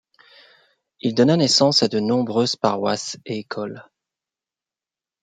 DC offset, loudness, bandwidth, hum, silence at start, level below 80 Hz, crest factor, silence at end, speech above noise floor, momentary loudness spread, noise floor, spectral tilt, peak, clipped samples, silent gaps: under 0.1%; -20 LUFS; 9.4 kHz; none; 1.05 s; -66 dBFS; 20 dB; 1.4 s; over 70 dB; 15 LU; under -90 dBFS; -4.5 dB/octave; -4 dBFS; under 0.1%; none